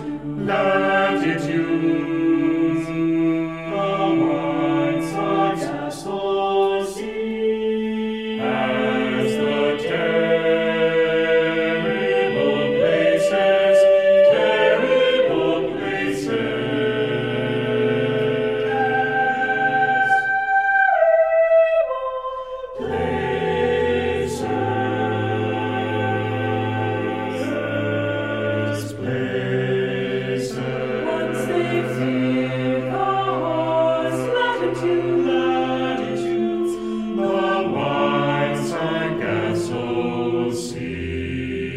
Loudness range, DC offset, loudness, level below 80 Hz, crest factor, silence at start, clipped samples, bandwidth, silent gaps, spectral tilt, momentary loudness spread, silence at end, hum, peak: 6 LU; under 0.1%; -20 LUFS; -50 dBFS; 16 dB; 0 s; under 0.1%; 13.5 kHz; none; -6 dB/octave; 8 LU; 0 s; none; -4 dBFS